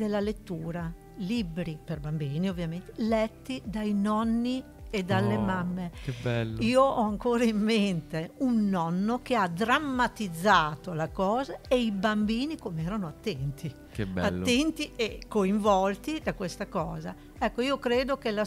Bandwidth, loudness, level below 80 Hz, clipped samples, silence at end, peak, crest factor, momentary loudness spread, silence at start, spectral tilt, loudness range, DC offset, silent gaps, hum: 15.5 kHz; -29 LUFS; -48 dBFS; under 0.1%; 0 s; -8 dBFS; 20 dB; 11 LU; 0 s; -6 dB/octave; 4 LU; under 0.1%; none; none